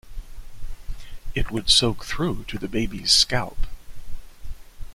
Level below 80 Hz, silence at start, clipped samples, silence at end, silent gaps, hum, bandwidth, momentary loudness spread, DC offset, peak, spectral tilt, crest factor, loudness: -32 dBFS; 0.05 s; under 0.1%; 0 s; none; none; 15.5 kHz; 25 LU; under 0.1%; -2 dBFS; -3 dB/octave; 22 dB; -21 LUFS